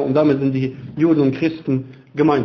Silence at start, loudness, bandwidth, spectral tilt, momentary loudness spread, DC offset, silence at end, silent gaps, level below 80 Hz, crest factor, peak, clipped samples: 0 s; -19 LUFS; 6.2 kHz; -9.5 dB/octave; 8 LU; under 0.1%; 0 s; none; -54 dBFS; 14 dB; -4 dBFS; under 0.1%